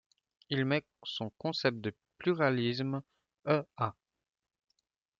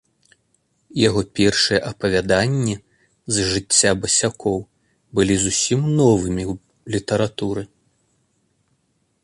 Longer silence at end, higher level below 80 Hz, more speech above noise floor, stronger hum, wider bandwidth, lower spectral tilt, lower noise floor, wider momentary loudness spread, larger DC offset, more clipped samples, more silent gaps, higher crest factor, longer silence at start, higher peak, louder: second, 1.3 s vs 1.6 s; second, -74 dBFS vs -44 dBFS; about the same, 49 dB vs 48 dB; neither; second, 7.4 kHz vs 11.5 kHz; first, -7 dB/octave vs -4 dB/octave; first, -82 dBFS vs -67 dBFS; about the same, 11 LU vs 13 LU; neither; neither; neither; about the same, 22 dB vs 20 dB; second, 0.5 s vs 0.95 s; second, -14 dBFS vs -2 dBFS; second, -34 LUFS vs -19 LUFS